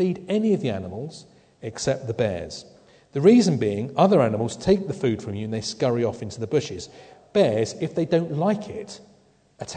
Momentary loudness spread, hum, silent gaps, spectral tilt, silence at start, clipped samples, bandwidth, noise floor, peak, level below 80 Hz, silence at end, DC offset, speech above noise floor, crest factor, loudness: 18 LU; none; none; -6.5 dB/octave; 0 s; under 0.1%; 9.4 kHz; -58 dBFS; -4 dBFS; -56 dBFS; 0 s; under 0.1%; 35 dB; 20 dB; -23 LUFS